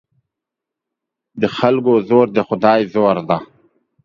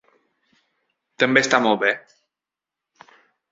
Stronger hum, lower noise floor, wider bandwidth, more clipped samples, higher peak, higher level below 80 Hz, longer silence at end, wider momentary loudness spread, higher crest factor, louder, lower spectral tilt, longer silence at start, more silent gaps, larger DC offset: neither; second, -83 dBFS vs -88 dBFS; second, 7.2 kHz vs 8 kHz; neither; about the same, 0 dBFS vs -2 dBFS; first, -58 dBFS vs -68 dBFS; second, 0.6 s vs 1.5 s; about the same, 8 LU vs 6 LU; about the same, 18 dB vs 22 dB; first, -15 LUFS vs -19 LUFS; first, -8 dB/octave vs -3.5 dB/octave; first, 1.35 s vs 1.2 s; neither; neither